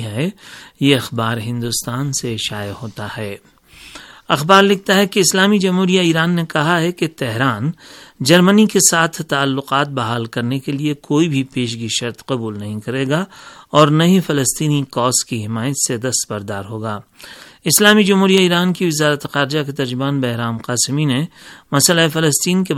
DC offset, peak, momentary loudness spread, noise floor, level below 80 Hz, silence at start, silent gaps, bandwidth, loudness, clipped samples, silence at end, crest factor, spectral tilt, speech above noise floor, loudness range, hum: under 0.1%; 0 dBFS; 14 LU; -39 dBFS; -56 dBFS; 0 s; none; 17.5 kHz; -16 LUFS; under 0.1%; 0 s; 16 dB; -4 dB/octave; 23 dB; 6 LU; none